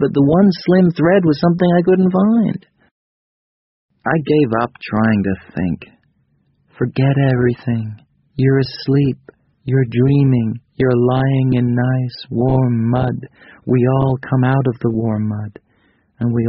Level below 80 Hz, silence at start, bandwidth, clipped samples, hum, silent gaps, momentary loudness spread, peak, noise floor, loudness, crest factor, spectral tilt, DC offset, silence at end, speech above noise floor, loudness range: -44 dBFS; 0 s; 5.8 kHz; under 0.1%; none; 2.91-3.89 s; 10 LU; -2 dBFS; -60 dBFS; -16 LUFS; 14 dB; -8 dB/octave; under 0.1%; 0 s; 46 dB; 4 LU